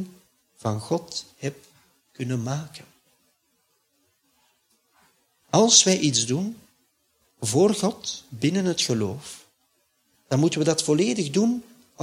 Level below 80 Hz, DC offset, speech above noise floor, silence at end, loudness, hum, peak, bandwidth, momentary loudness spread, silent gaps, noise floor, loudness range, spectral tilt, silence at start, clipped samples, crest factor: -66 dBFS; under 0.1%; 47 dB; 0 s; -23 LUFS; none; -2 dBFS; 16 kHz; 17 LU; none; -70 dBFS; 15 LU; -4 dB/octave; 0 s; under 0.1%; 24 dB